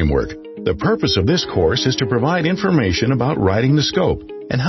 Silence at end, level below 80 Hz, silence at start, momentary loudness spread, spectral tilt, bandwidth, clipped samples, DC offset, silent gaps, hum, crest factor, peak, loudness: 0 s; -34 dBFS; 0 s; 7 LU; -6 dB/octave; 6.2 kHz; under 0.1%; under 0.1%; none; none; 14 dB; -4 dBFS; -17 LUFS